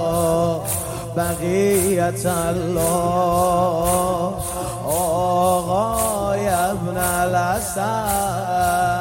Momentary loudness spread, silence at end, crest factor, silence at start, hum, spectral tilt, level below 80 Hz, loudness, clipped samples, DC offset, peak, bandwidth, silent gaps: 5 LU; 0 s; 14 dB; 0 s; none; -5 dB/octave; -40 dBFS; -20 LUFS; under 0.1%; under 0.1%; -6 dBFS; 16.5 kHz; none